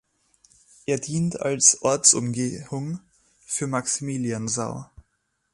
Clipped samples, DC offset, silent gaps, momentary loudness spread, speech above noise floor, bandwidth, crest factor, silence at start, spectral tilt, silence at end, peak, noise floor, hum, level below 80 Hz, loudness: under 0.1%; under 0.1%; none; 16 LU; 50 dB; 11.5 kHz; 24 dB; 0.9 s; -3.5 dB/octave; 0.7 s; -2 dBFS; -73 dBFS; none; -60 dBFS; -22 LUFS